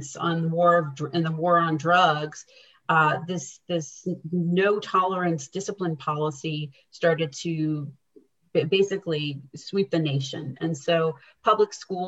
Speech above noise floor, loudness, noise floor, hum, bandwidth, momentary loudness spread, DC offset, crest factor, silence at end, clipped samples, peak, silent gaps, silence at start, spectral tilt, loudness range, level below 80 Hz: 34 dB; -25 LUFS; -59 dBFS; none; 8.2 kHz; 12 LU; under 0.1%; 18 dB; 0 s; under 0.1%; -6 dBFS; none; 0 s; -5.5 dB/octave; 4 LU; -72 dBFS